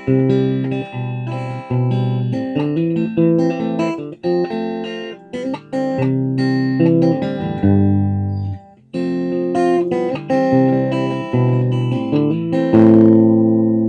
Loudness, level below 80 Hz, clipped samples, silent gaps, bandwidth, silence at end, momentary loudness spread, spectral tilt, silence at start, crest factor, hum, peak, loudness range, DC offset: -17 LUFS; -54 dBFS; under 0.1%; none; 8.8 kHz; 0 s; 12 LU; -9 dB/octave; 0 s; 16 dB; none; 0 dBFS; 5 LU; under 0.1%